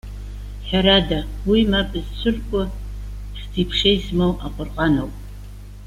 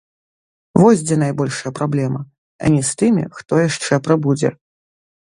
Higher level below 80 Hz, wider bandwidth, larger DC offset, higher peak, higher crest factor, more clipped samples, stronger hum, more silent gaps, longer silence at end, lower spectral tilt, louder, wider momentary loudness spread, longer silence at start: first, -30 dBFS vs -52 dBFS; first, 15 kHz vs 11.5 kHz; neither; second, -4 dBFS vs 0 dBFS; about the same, 18 dB vs 18 dB; neither; first, 50 Hz at -30 dBFS vs none; second, none vs 2.38-2.59 s; second, 0 s vs 0.7 s; about the same, -6.5 dB/octave vs -6 dB/octave; second, -20 LUFS vs -17 LUFS; first, 19 LU vs 10 LU; second, 0.05 s vs 0.75 s